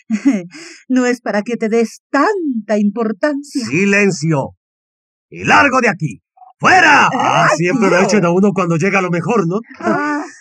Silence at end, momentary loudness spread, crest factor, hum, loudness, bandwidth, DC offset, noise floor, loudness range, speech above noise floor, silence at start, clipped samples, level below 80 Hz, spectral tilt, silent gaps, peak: 0.1 s; 10 LU; 14 dB; none; -14 LUFS; 11 kHz; under 0.1%; under -90 dBFS; 5 LU; over 76 dB; 0.1 s; under 0.1%; -62 dBFS; -5 dB/octave; 2.00-2.10 s, 4.57-5.29 s; -2 dBFS